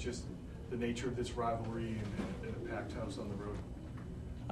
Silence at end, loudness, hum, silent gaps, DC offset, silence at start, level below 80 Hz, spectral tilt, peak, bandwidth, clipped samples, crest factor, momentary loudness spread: 0 s; -41 LUFS; none; none; under 0.1%; 0 s; -50 dBFS; -6.5 dB/octave; -26 dBFS; 13 kHz; under 0.1%; 16 dB; 9 LU